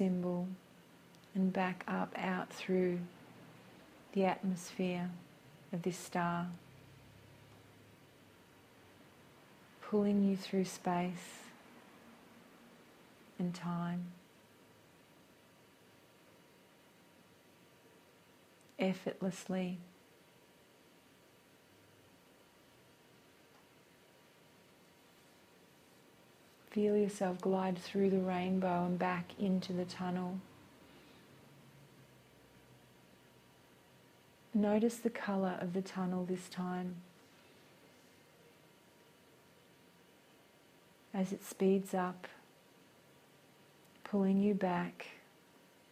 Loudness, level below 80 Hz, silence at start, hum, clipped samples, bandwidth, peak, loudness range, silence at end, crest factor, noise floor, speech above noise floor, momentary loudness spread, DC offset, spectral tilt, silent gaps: -37 LUFS; -78 dBFS; 0 s; none; under 0.1%; 15.5 kHz; -20 dBFS; 11 LU; 0.7 s; 20 dB; -65 dBFS; 29 dB; 27 LU; under 0.1%; -6.5 dB/octave; none